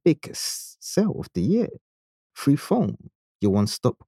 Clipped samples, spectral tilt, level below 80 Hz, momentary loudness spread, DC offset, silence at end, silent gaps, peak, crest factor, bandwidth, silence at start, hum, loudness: under 0.1%; -6 dB/octave; -58 dBFS; 7 LU; under 0.1%; 0.15 s; 1.81-2.30 s, 3.15-3.40 s; -6 dBFS; 18 dB; 15.5 kHz; 0.05 s; none; -25 LUFS